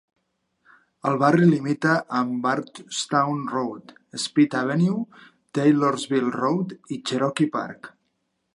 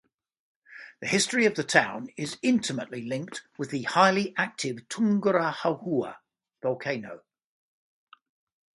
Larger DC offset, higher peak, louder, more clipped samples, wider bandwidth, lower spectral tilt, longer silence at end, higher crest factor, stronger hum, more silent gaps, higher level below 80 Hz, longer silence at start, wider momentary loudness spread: neither; about the same, -4 dBFS vs -4 dBFS; first, -23 LUFS vs -27 LUFS; neither; about the same, 11.5 kHz vs 11.5 kHz; first, -6 dB/octave vs -4 dB/octave; second, 0.65 s vs 1.6 s; second, 18 dB vs 26 dB; neither; neither; about the same, -74 dBFS vs -72 dBFS; first, 1.05 s vs 0.7 s; about the same, 12 LU vs 14 LU